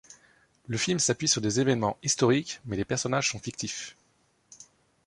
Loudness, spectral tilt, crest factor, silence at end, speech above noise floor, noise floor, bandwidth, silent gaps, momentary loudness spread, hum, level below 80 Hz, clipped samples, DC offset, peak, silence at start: -27 LUFS; -3.5 dB/octave; 20 dB; 0.45 s; 41 dB; -68 dBFS; 11.5 kHz; none; 10 LU; none; -60 dBFS; under 0.1%; under 0.1%; -8 dBFS; 0.1 s